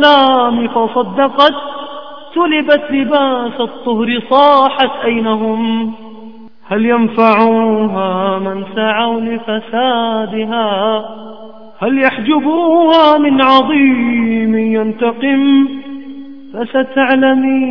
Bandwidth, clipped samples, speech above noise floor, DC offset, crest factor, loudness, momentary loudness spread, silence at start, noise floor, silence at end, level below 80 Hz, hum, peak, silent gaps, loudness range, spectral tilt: 5.4 kHz; 0.2%; 23 dB; 1%; 12 dB; -12 LUFS; 13 LU; 0 s; -35 dBFS; 0 s; -58 dBFS; none; 0 dBFS; none; 5 LU; -7 dB/octave